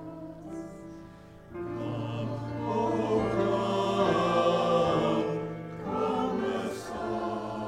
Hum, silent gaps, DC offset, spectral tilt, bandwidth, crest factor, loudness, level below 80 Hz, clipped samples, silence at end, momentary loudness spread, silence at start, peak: none; none; under 0.1%; -6.5 dB/octave; 15 kHz; 16 dB; -29 LUFS; -56 dBFS; under 0.1%; 0 s; 17 LU; 0 s; -14 dBFS